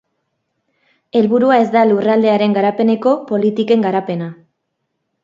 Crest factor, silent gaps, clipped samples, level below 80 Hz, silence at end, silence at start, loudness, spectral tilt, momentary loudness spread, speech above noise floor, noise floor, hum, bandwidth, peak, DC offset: 16 dB; none; under 0.1%; -64 dBFS; 0.9 s; 1.15 s; -14 LUFS; -8 dB/octave; 8 LU; 59 dB; -72 dBFS; none; 7.4 kHz; 0 dBFS; under 0.1%